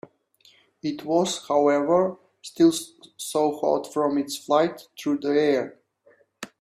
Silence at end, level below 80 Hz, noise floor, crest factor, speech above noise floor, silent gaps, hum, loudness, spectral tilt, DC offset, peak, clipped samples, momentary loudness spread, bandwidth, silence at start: 0.15 s; -70 dBFS; -60 dBFS; 18 dB; 37 dB; none; none; -24 LUFS; -4.5 dB/octave; under 0.1%; -6 dBFS; under 0.1%; 16 LU; 15.5 kHz; 0.85 s